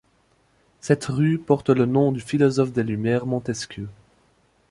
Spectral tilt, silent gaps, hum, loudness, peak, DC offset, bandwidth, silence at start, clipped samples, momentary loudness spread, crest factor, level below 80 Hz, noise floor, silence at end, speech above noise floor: -7 dB/octave; none; none; -22 LUFS; -4 dBFS; under 0.1%; 11.5 kHz; 0.85 s; under 0.1%; 13 LU; 20 dB; -56 dBFS; -63 dBFS; 0.8 s; 41 dB